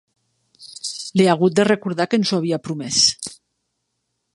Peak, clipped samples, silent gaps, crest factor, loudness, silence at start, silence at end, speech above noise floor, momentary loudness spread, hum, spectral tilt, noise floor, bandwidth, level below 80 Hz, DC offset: -2 dBFS; under 0.1%; none; 20 dB; -18 LUFS; 0.6 s; 1 s; 57 dB; 15 LU; none; -4 dB/octave; -75 dBFS; 11.5 kHz; -62 dBFS; under 0.1%